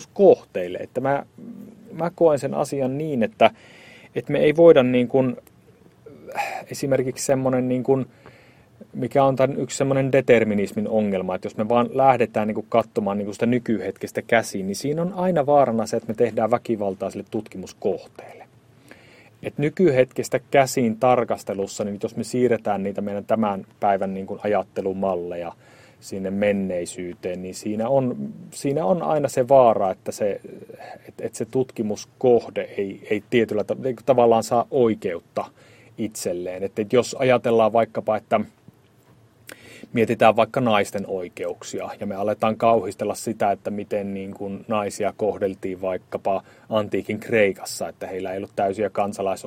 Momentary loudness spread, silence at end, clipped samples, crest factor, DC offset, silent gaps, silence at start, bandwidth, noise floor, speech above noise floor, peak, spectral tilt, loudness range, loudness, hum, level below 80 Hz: 13 LU; 0 s; under 0.1%; 22 dB; under 0.1%; none; 0 s; 16 kHz; -55 dBFS; 33 dB; 0 dBFS; -6 dB/octave; 6 LU; -22 LUFS; none; -62 dBFS